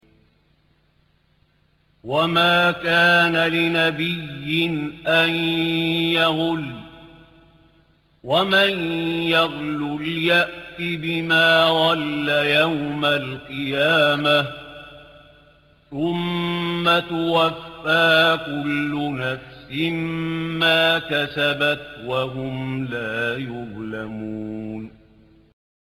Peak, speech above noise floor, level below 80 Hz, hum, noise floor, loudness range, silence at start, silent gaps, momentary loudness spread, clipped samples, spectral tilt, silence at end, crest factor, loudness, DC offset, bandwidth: -6 dBFS; 41 dB; -56 dBFS; none; -62 dBFS; 5 LU; 2.05 s; none; 15 LU; under 0.1%; -5.5 dB/octave; 1 s; 16 dB; -20 LUFS; under 0.1%; 17 kHz